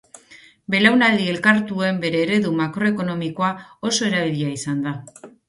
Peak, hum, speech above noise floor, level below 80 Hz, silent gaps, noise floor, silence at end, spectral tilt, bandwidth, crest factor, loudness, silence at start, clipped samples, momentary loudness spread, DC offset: -2 dBFS; none; 29 dB; -62 dBFS; none; -49 dBFS; 0.2 s; -4.5 dB/octave; 11.5 kHz; 18 dB; -20 LUFS; 0.3 s; under 0.1%; 10 LU; under 0.1%